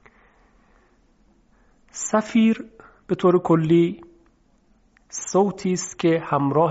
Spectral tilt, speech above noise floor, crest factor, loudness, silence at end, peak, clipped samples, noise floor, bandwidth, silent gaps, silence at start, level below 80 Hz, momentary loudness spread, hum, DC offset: -6.5 dB/octave; 40 dB; 16 dB; -21 LUFS; 0 s; -6 dBFS; under 0.1%; -60 dBFS; 8 kHz; none; 1.95 s; -60 dBFS; 15 LU; none; under 0.1%